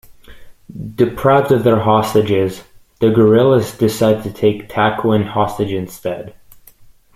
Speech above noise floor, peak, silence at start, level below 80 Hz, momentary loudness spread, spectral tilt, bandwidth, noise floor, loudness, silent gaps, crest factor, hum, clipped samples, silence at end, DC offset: 30 dB; 0 dBFS; 0.1 s; -46 dBFS; 14 LU; -7 dB/octave; 15.5 kHz; -44 dBFS; -15 LUFS; none; 14 dB; none; under 0.1%; 0.85 s; under 0.1%